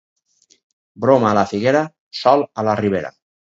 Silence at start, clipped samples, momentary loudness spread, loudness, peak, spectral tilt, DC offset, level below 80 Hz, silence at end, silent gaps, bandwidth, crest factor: 1 s; under 0.1%; 9 LU; -17 LUFS; 0 dBFS; -6.5 dB/octave; under 0.1%; -54 dBFS; 0.4 s; 1.99-2.11 s; 7.8 kHz; 18 dB